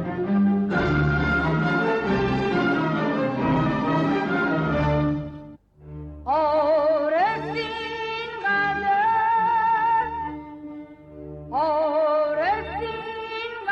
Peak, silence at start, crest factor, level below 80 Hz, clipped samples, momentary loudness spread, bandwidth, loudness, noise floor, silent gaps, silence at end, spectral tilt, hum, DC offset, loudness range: -10 dBFS; 0 s; 12 dB; -42 dBFS; under 0.1%; 16 LU; 7.6 kHz; -23 LUFS; -44 dBFS; none; 0 s; -8 dB/octave; none; under 0.1%; 2 LU